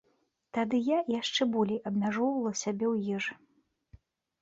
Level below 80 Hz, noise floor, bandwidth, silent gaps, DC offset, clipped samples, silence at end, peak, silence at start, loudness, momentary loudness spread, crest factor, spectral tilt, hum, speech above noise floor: -70 dBFS; -74 dBFS; 8 kHz; none; under 0.1%; under 0.1%; 1.1 s; -16 dBFS; 0.55 s; -31 LUFS; 6 LU; 16 dB; -4.5 dB/octave; none; 44 dB